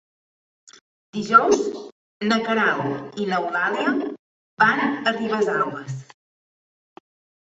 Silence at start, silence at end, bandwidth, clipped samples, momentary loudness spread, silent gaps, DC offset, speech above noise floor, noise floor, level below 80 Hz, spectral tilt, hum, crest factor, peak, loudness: 1.15 s; 1.45 s; 8.2 kHz; under 0.1%; 17 LU; 1.92-2.20 s, 4.19-4.57 s; under 0.1%; over 69 dB; under -90 dBFS; -66 dBFS; -4.5 dB/octave; none; 22 dB; -2 dBFS; -21 LUFS